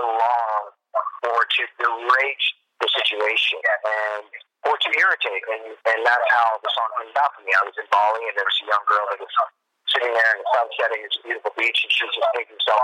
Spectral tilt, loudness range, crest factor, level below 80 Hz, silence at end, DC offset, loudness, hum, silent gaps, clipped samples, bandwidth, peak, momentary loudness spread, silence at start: 0.5 dB/octave; 1 LU; 16 dB; under -90 dBFS; 0 s; under 0.1%; -21 LUFS; none; none; under 0.1%; 12.5 kHz; -6 dBFS; 8 LU; 0 s